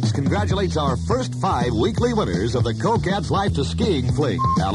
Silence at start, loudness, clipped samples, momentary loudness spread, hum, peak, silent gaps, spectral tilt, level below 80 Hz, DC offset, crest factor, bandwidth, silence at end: 0 s; -21 LUFS; under 0.1%; 2 LU; none; -8 dBFS; none; -6.5 dB/octave; -34 dBFS; under 0.1%; 12 dB; 11.5 kHz; 0 s